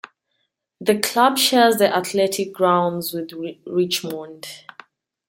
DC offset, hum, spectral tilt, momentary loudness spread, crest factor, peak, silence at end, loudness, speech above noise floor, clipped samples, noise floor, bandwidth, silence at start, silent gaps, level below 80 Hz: under 0.1%; none; -3.5 dB/octave; 17 LU; 20 dB; 0 dBFS; 0.7 s; -19 LUFS; 53 dB; under 0.1%; -73 dBFS; 17 kHz; 0.8 s; none; -70 dBFS